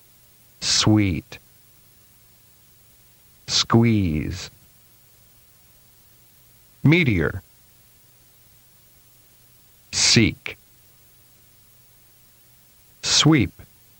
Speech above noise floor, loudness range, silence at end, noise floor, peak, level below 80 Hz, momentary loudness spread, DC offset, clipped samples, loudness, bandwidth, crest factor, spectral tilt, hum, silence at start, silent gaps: 35 dB; 2 LU; 0.5 s; -54 dBFS; -2 dBFS; -46 dBFS; 22 LU; under 0.1%; under 0.1%; -19 LUFS; 18 kHz; 22 dB; -4 dB/octave; none; 0.6 s; none